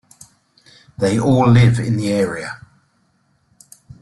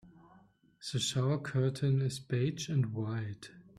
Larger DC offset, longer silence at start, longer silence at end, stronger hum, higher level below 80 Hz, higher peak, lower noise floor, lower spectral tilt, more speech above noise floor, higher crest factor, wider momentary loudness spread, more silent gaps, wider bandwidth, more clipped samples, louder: neither; first, 1 s vs 0.05 s; first, 1.45 s vs 0.15 s; neither; first, -46 dBFS vs -68 dBFS; first, -2 dBFS vs -20 dBFS; about the same, -62 dBFS vs -64 dBFS; first, -7 dB/octave vs -5.5 dB/octave; first, 47 dB vs 31 dB; about the same, 16 dB vs 14 dB; first, 17 LU vs 9 LU; neither; about the same, 12 kHz vs 13 kHz; neither; first, -16 LUFS vs -34 LUFS